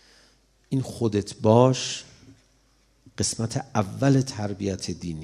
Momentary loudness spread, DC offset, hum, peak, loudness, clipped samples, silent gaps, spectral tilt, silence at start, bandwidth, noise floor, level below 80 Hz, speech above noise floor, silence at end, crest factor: 12 LU; under 0.1%; none; -4 dBFS; -25 LUFS; under 0.1%; none; -5.5 dB/octave; 0.7 s; 12.5 kHz; -63 dBFS; -56 dBFS; 39 dB; 0 s; 22 dB